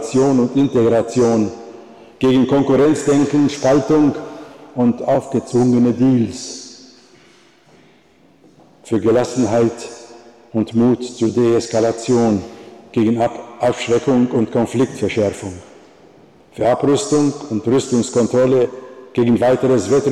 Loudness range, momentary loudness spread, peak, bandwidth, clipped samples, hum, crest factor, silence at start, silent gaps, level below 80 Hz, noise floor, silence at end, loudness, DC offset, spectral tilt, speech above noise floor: 6 LU; 15 LU; -6 dBFS; 11.5 kHz; under 0.1%; none; 10 dB; 0 s; none; -52 dBFS; -51 dBFS; 0 s; -16 LUFS; under 0.1%; -6.5 dB/octave; 36 dB